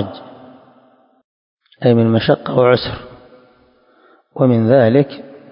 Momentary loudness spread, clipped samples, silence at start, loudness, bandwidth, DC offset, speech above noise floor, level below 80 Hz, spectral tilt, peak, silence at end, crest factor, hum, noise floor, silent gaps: 21 LU; under 0.1%; 0 s; -14 LUFS; 5.4 kHz; under 0.1%; 40 dB; -48 dBFS; -11.5 dB/octave; 0 dBFS; 0.25 s; 16 dB; none; -53 dBFS; 1.24-1.57 s